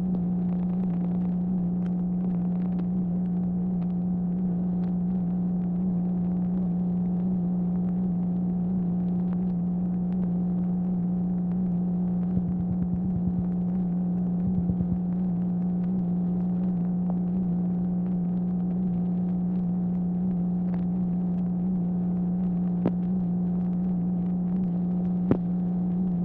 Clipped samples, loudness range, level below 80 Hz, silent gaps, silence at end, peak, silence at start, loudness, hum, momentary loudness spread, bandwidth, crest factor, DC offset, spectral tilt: under 0.1%; 0 LU; -48 dBFS; none; 0 s; -8 dBFS; 0 s; -27 LUFS; 60 Hz at -40 dBFS; 1 LU; 2.1 kHz; 18 dB; under 0.1%; -13.5 dB/octave